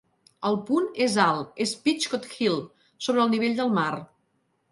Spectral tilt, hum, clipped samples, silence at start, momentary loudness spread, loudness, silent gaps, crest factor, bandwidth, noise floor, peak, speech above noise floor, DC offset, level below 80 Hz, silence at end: -4.5 dB/octave; none; under 0.1%; 0.4 s; 8 LU; -25 LUFS; none; 20 dB; 11.5 kHz; -71 dBFS; -6 dBFS; 47 dB; under 0.1%; -72 dBFS; 0.65 s